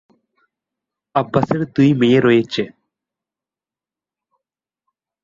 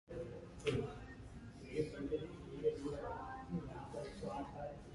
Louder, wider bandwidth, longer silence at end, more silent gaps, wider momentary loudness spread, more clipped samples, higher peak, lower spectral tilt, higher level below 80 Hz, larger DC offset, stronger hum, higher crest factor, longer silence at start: first, -16 LUFS vs -45 LUFS; second, 7.6 kHz vs 11.5 kHz; first, 2.55 s vs 0 s; neither; about the same, 11 LU vs 11 LU; neither; first, -2 dBFS vs -24 dBFS; about the same, -7.5 dB/octave vs -6.5 dB/octave; about the same, -56 dBFS vs -58 dBFS; neither; neither; about the same, 18 dB vs 20 dB; first, 1.15 s vs 0.1 s